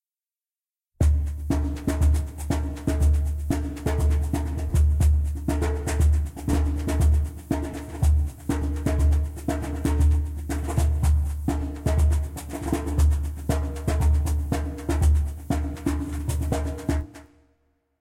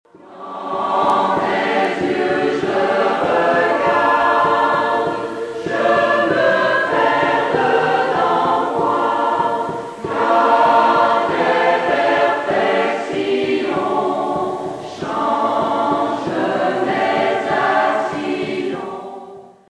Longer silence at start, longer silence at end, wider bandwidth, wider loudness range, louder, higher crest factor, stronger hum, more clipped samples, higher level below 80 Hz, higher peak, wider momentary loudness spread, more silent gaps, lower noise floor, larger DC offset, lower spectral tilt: first, 1 s vs 0.25 s; first, 0.8 s vs 0.25 s; first, 15 kHz vs 11 kHz; about the same, 2 LU vs 4 LU; second, -25 LUFS vs -17 LUFS; about the same, 12 dB vs 14 dB; neither; neither; first, -26 dBFS vs -56 dBFS; second, -10 dBFS vs -2 dBFS; second, 7 LU vs 10 LU; neither; first, under -90 dBFS vs -38 dBFS; neither; first, -7 dB/octave vs -5 dB/octave